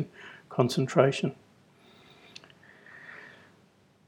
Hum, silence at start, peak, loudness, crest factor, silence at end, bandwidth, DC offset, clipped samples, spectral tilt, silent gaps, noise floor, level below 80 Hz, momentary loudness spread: none; 0 s; -6 dBFS; -27 LUFS; 26 dB; 0.8 s; 16.5 kHz; under 0.1%; under 0.1%; -6 dB/octave; none; -62 dBFS; -76 dBFS; 25 LU